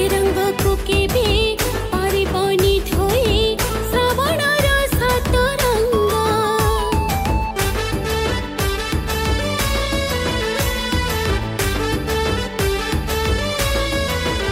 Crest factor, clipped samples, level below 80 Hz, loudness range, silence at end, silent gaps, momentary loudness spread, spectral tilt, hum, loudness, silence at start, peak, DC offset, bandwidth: 14 dB; under 0.1%; -26 dBFS; 3 LU; 0 s; none; 4 LU; -4.5 dB/octave; none; -19 LUFS; 0 s; -4 dBFS; under 0.1%; 16.5 kHz